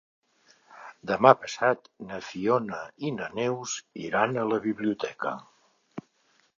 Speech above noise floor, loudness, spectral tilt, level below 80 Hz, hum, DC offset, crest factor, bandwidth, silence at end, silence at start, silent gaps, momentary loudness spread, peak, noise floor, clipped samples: 40 dB; -27 LUFS; -5 dB/octave; -70 dBFS; none; under 0.1%; 28 dB; 7.6 kHz; 0.6 s; 0.7 s; none; 23 LU; 0 dBFS; -67 dBFS; under 0.1%